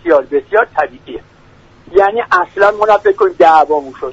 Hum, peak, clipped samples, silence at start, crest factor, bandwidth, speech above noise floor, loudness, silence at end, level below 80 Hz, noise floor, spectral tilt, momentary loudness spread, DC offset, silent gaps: none; 0 dBFS; under 0.1%; 0.05 s; 12 dB; 7.8 kHz; 32 dB; -12 LUFS; 0 s; -46 dBFS; -43 dBFS; -5 dB/octave; 12 LU; under 0.1%; none